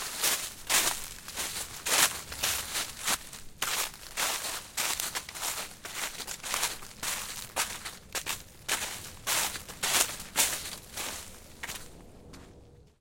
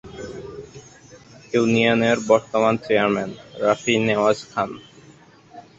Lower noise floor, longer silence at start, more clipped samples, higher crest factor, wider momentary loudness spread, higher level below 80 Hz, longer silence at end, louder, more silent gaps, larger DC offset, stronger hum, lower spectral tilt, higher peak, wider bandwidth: first, -54 dBFS vs -49 dBFS; about the same, 0 s vs 0.05 s; neither; first, 28 dB vs 20 dB; second, 14 LU vs 19 LU; about the same, -56 dBFS vs -56 dBFS; about the same, 0.15 s vs 0.2 s; second, -31 LUFS vs -20 LUFS; neither; neither; neither; second, 0.5 dB/octave vs -5 dB/octave; second, -6 dBFS vs -2 dBFS; first, 17 kHz vs 8 kHz